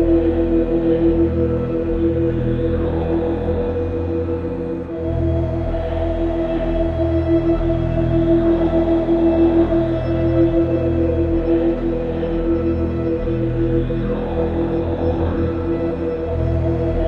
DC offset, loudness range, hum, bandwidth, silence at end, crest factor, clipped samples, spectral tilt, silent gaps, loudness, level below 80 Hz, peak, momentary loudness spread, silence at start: under 0.1%; 5 LU; none; 5.4 kHz; 0 s; 14 dB; under 0.1%; -10.5 dB/octave; none; -19 LUFS; -28 dBFS; -4 dBFS; 6 LU; 0 s